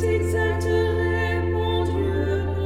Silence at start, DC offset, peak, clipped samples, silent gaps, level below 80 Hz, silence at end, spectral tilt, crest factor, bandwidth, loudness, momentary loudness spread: 0 s; under 0.1%; -10 dBFS; under 0.1%; none; -34 dBFS; 0 s; -7 dB/octave; 10 dB; 12.5 kHz; -23 LUFS; 2 LU